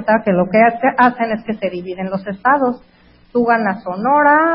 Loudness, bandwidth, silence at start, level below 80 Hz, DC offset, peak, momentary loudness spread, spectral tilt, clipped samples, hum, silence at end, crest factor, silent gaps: -16 LUFS; 5.6 kHz; 0 s; -54 dBFS; under 0.1%; 0 dBFS; 11 LU; -10 dB/octave; under 0.1%; none; 0 s; 16 dB; none